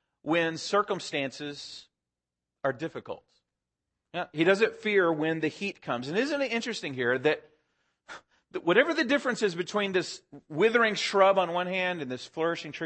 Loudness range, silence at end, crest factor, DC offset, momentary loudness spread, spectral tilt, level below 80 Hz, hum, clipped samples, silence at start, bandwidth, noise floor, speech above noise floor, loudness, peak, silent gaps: 8 LU; 0 s; 22 dB; under 0.1%; 17 LU; -4.5 dB/octave; -76 dBFS; none; under 0.1%; 0.25 s; 8.8 kHz; -89 dBFS; 61 dB; -28 LUFS; -8 dBFS; none